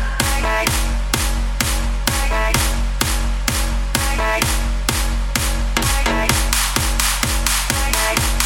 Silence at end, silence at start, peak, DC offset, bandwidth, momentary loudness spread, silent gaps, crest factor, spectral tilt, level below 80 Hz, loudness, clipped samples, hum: 0 s; 0 s; 0 dBFS; under 0.1%; 17 kHz; 4 LU; none; 16 dB; -2.5 dB/octave; -20 dBFS; -18 LUFS; under 0.1%; none